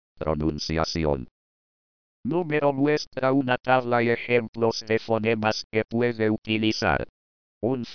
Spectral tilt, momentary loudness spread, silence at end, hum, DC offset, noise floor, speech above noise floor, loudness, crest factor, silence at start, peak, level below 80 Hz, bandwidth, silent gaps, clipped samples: -6 dB/octave; 6 LU; 0 s; none; 0.4%; under -90 dBFS; over 66 dB; -25 LUFS; 18 dB; 0.2 s; -6 dBFS; -46 dBFS; 5.4 kHz; 1.31-2.24 s, 3.07-3.11 s, 4.49-4.53 s, 5.64-5.70 s, 6.38-6.42 s, 7.09-7.61 s; under 0.1%